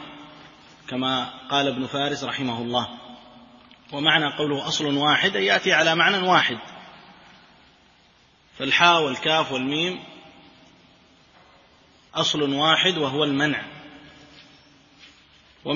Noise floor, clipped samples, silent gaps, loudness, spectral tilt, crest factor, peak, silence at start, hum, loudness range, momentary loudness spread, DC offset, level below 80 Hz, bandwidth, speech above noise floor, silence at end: -57 dBFS; under 0.1%; none; -21 LUFS; -3.5 dB/octave; 22 dB; -2 dBFS; 0 s; none; 7 LU; 19 LU; under 0.1%; -64 dBFS; 7.4 kHz; 35 dB; 0 s